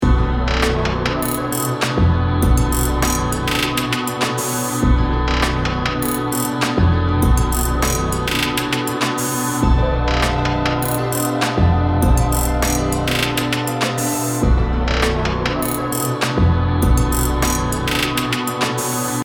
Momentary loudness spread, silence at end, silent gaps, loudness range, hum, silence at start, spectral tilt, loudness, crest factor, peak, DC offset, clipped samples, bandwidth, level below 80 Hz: 3 LU; 0 s; none; 1 LU; none; 0 s; -4.5 dB/octave; -18 LUFS; 14 dB; -2 dBFS; under 0.1%; under 0.1%; over 20 kHz; -22 dBFS